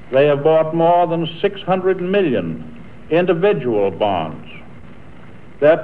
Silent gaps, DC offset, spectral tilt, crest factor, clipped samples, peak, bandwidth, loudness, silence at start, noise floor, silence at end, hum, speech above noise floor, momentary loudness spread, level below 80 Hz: none; 2%; -9 dB/octave; 14 dB; under 0.1%; -2 dBFS; 4.7 kHz; -17 LUFS; 0.1 s; -41 dBFS; 0 s; none; 25 dB; 14 LU; -52 dBFS